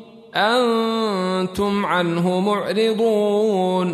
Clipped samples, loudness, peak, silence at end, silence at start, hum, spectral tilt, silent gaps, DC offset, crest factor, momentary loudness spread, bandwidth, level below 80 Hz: under 0.1%; -19 LUFS; -6 dBFS; 0 s; 0 s; none; -6 dB/octave; none; under 0.1%; 14 dB; 4 LU; 13.5 kHz; -54 dBFS